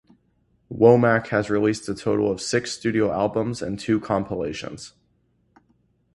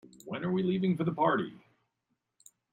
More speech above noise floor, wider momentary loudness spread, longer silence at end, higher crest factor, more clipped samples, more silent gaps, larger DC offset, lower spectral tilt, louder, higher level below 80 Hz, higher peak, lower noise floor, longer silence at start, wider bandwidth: second, 44 dB vs 53 dB; first, 15 LU vs 11 LU; about the same, 1.25 s vs 1.15 s; about the same, 22 dB vs 18 dB; neither; neither; neither; second, -6 dB/octave vs -7.5 dB/octave; first, -22 LUFS vs -31 LUFS; first, -54 dBFS vs -72 dBFS; first, -2 dBFS vs -16 dBFS; second, -66 dBFS vs -82 dBFS; first, 0.7 s vs 0.25 s; first, 11.5 kHz vs 9.2 kHz